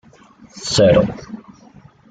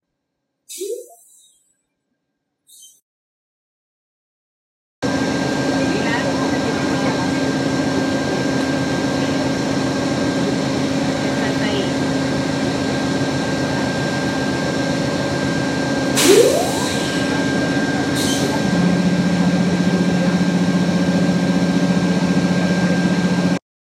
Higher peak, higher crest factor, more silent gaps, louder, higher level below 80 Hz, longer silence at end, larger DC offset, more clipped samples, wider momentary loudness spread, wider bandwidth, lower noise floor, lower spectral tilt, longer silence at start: about the same, -2 dBFS vs 0 dBFS; about the same, 18 dB vs 18 dB; second, none vs 3.02-5.02 s; first, -15 LUFS vs -18 LUFS; about the same, -44 dBFS vs -46 dBFS; first, 0.7 s vs 0.25 s; neither; neither; first, 23 LU vs 3 LU; second, 9.4 kHz vs 16 kHz; second, -46 dBFS vs -76 dBFS; about the same, -5 dB/octave vs -5 dB/octave; second, 0.55 s vs 0.7 s